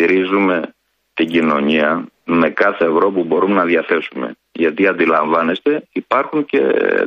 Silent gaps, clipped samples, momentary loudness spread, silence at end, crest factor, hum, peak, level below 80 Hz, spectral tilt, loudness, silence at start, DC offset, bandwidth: none; under 0.1%; 8 LU; 0 s; 14 dB; none; -2 dBFS; -60 dBFS; -7.5 dB/octave; -16 LUFS; 0 s; under 0.1%; 6.4 kHz